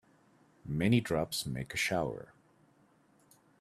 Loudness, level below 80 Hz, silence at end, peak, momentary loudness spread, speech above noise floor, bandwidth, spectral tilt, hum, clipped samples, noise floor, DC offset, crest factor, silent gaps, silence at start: -33 LUFS; -60 dBFS; 1.35 s; -14 dBFS; 18 LU; 35 dB; 15 kHz; -5 dB/octave; none; under 0.1%; -67 dBFS; under 0.1%; 22 dB; none; 0.65 s